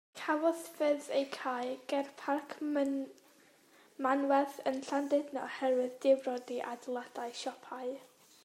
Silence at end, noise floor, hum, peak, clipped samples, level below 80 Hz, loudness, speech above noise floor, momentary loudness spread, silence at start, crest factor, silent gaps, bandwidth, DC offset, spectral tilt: 0.4 s; -64 dBFS; none; -16 dBFS; under 0.1%; under -90 dBFS; -35 LUFS; 30 dB; 11 LU; 0.15 s; 18 dB; none; 16 kHz; under 0.1%; -3 dB/octave